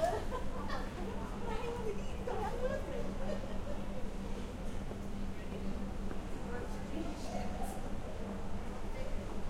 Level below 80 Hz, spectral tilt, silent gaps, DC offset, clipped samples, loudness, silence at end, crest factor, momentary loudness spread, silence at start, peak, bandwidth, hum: -42 dBFS; -6 dB/octave; none; under 0.1%; under 0.1%; -42 LUFS; 0 s; 16 dB; 5 LU; 0 s; -22 dBFS; 14 kHz; none